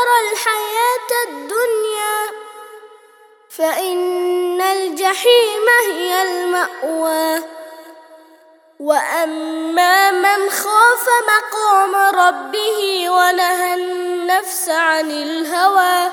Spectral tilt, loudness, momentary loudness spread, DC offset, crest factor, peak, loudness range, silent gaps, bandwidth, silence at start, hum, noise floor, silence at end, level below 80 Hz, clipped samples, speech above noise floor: 0.5 dB/octave; -15 LUFS; 9 LU; under 0.1%; 16 dB; 0 dBFS; 7 LU; none; over 20 kHz; 0 s; none; -48 dBFS; 0 s; -78 dBFS; under 0.1%; 32 dB